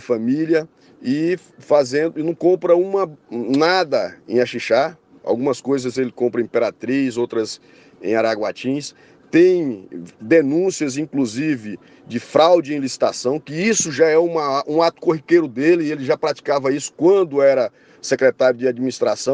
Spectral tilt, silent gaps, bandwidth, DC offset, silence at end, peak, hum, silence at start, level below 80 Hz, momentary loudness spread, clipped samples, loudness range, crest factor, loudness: -4.5 dB/octave; none; 10 kHz; under 0.1%; 0 s; -2 dBFS; none; 0 s; -68 dBFS; 11 LU; under 0.1%; 3 LU; 16 dB; -19 LUFS